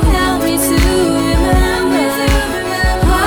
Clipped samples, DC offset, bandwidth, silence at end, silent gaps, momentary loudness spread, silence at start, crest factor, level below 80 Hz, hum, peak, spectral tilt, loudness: under 0.1%; under 0.1%; over 20 kHz; 0 s; none; 3 LU; 0 s; 10 dB; -18 dBFS; none; -2 dBFS; -5 dB/octave; -13 LUFS